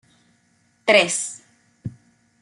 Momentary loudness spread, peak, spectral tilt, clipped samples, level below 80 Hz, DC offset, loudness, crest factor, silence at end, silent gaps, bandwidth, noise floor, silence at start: 22 LU; -2 dBFS; -2 dB/octave; under 0.1%; -64 dBFS; under 0.1%; -19 LUFS; 22 dB; 0.5 s; none; 11.5 kHz; -63 dBFS; 0.85 s